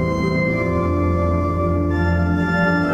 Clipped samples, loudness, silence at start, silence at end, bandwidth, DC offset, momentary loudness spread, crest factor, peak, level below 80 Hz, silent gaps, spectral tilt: under 0.1%; -19 LUFS; 0 s; 0 s; 7.4 kHz; under 0.1%; 2 LU; 12 dB; -6 dBFS; -32 dBFS; none; -8.5 dB/octave